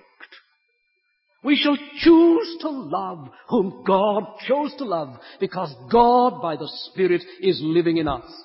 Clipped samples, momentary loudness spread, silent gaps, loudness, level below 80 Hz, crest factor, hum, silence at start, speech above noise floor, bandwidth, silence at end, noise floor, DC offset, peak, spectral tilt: under 0.1%; 14 LU; none; -21 LUFS; -52 dBFS; 18 dB; none; 0.2 s; 50 dB; 5.8 kHz; 0.05 s; -70 dBFS; under 0.1%; -4 dBFS; -10 dB/octave